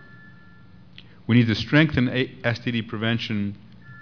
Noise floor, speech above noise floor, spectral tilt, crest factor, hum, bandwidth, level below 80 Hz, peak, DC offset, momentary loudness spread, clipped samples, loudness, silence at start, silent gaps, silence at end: -50 dBFS; 28 dB; -7 dB/octave; 20 dB; none; 5.4 kHz; -50 dBFS; -4 dBFS; 0.3%; 11 LU; under 0.1%; -23 LUFS; 1.3 s; none; 0 s